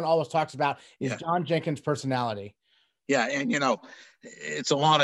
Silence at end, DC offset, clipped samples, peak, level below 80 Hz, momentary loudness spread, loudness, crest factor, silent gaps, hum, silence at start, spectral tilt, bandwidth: 0 s; under 0.1%; under 0.1%; -8 dBFS; -74 dBFS; 14 LU; -27 LUFS; 20 dB; none; none; 0 s; -4.5 dB/octave; 12 kHz